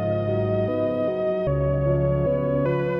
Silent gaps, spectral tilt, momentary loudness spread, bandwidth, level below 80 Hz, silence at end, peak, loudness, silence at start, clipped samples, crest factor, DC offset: none; -11 dB/octave; 2 LU; 5.4 kHz; -38 dBFS; 0 s; -10 dBFS; -23 LUFS; 0 s; under 0.1%; 12 dB; under 0.1%